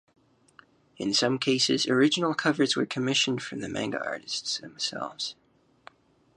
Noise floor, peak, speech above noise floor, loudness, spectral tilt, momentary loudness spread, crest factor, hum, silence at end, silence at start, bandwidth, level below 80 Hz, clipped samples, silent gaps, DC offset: -59 dBFS; -10 dBFS; 31 dB; -27 LUFS; -3.5 dB/octave; 10 LU; 20 dB; none; 1.05 s; 1 s; 11 kHz; -70 dBFS; under 0.1%; none; under 0.1%